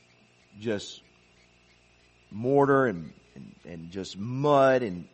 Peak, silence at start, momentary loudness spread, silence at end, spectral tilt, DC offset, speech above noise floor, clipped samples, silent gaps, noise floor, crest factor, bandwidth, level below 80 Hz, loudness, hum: -8 dBFS; 0.55 s; 23 LU; 0.1 s; -6.5 dB/octave; under 0.1%; 35 dB; under 0.1%; none; -61 dBFS; 20 dB; 8.4 kHz; -64 dBFS; -26 LUFS; 60 Hz at -60 dBFS